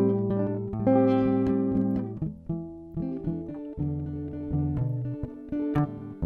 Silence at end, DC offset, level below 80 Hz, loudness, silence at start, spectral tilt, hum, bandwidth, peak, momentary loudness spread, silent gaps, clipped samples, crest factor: 0 s; under 0.1%; -46 dBFS; -28 LUFS; 0 s; -11.5 dB/octave; none; 4.5 kHz; -10 dBFS; 12 LU; none; under 0.1%; 16 dB